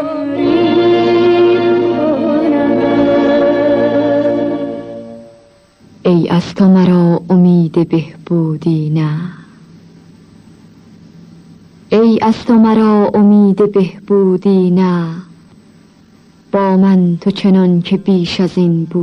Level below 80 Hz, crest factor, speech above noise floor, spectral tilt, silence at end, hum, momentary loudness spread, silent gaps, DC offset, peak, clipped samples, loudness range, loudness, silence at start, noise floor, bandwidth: -48 dBFS; 10 dB; 35 dB; -8.5 dB/octave; 0 s; none; 9 LU; none; under 0.1%; -2 dBFS; under 0.1%; 7 LU; -12 LUFS; 0 s; -45 dBFS; 6.6 kHz